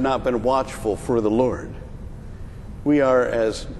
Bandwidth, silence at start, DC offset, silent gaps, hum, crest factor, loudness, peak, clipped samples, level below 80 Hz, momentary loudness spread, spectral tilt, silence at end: 12.5 kHz; 0 s; under 0.1%; none; none; 16 dB; -21 LUFS; -6 dBFS; under 0.1%; -38 dBFS; 20 LU; -6.5 dB/octave; 0 s